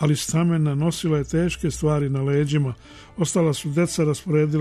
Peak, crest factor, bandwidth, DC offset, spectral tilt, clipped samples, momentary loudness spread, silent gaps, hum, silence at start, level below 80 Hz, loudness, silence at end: -10 dBFS; 12 dB; 13.5 kHz; under 0.1%; -6 dB/octave; under 0.1%; 3 LU; none; none; 0 s; -44 dBFS; -22 LUFS; 0 s